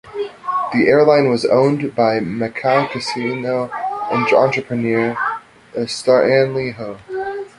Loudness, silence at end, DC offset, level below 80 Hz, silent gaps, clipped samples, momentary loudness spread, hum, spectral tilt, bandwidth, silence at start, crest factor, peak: -17 LUFS; 0.1 s; under 0.1%; -56 dBFS; none; under 0.1%; 13 LU; none; -6 dB/octave; 11.5 kHz; 0.05 s; 16 dB; 0 dBFS